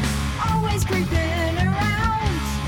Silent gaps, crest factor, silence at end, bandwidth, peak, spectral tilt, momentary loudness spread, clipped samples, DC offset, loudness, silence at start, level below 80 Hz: none; 10 dB; 0 s; 17.5 kHz; -12 dBFS; -5.5 dB/octave; 3 LU; under 0.1%; under 0.1%; -22 LUFS; 0 s; -30 dBFS